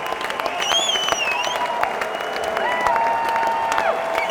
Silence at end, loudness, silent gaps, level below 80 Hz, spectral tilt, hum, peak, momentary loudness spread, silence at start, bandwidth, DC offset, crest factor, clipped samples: 0 s; -20 LUFS; none; -54 dBFS; -0.5 dB/octave; none; 0 dBFS; 6 LU; 0 s; over 20 kHz; under 0.1%; 20 dB; under 0.1%